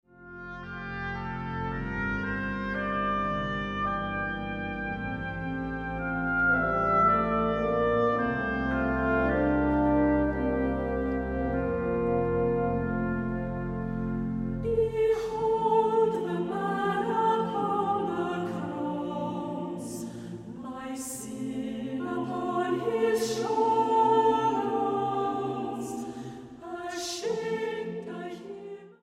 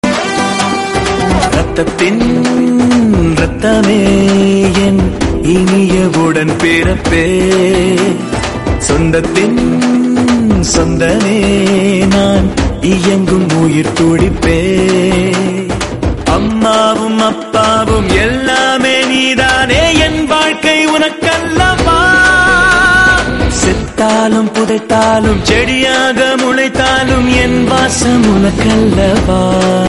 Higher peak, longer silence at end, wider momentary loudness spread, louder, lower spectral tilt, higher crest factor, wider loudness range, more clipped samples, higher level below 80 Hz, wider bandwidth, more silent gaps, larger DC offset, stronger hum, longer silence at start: second, -12 dBFS vs 0 dBFS; about the same, 0.1 s vs 0 s; first, 13 LU vs 4 LU; second, -29 LUFS vs -10 LUFS; first, -6 dB/octave vs -4.5 dB/octave; first, 16 dB vs 10 dB; first, 8 LU vs 3 LU; neither; second, -44 dBFS vs -24 dBFS; first, 15.5 kHz vs 11.5 kHz; neither; second, under 0.1% vs 0.5%; neither; first, 0.2 s vs 0.05 s